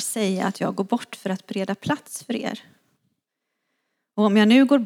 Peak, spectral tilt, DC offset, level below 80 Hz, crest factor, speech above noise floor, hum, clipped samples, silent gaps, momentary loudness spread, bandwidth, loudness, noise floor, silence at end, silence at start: -4 dBFS; -5 dB/octave; under 0.1%; -74 dBFS; 18 dB; 58 dB; none; under 0.1%; none; 15 LU; 16.5 kHz; -23 LUFS; -80 dBFS; 0 s; 0 s